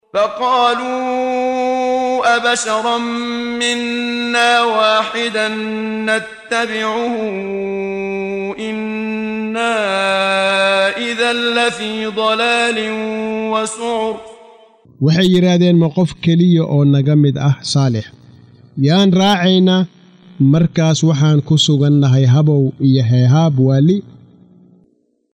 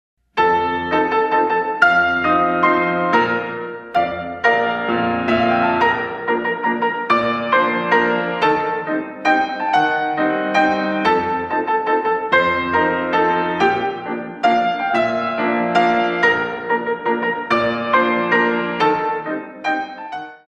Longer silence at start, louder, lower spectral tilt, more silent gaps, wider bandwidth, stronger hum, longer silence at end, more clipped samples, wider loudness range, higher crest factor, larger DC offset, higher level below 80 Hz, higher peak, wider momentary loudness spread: second, 0.15 s vs 0.35 s; first, -15 LUFS vs -18 LUFS; about the same, -5.5 dB/octave vs -6 dB/octave; neither; first, 11 kHz vs 9 kHz; neither; first, 1.25 s vs 0.1 s; neither; first, 6 LU vs 2 LU; about the same, 14 dB vs 18 dB; neither; about the same, -54 dBFS vs -54 dBFS; about the same, -2 dBFS vs 0 dBFS; about the same, 9 LU vs 7 LU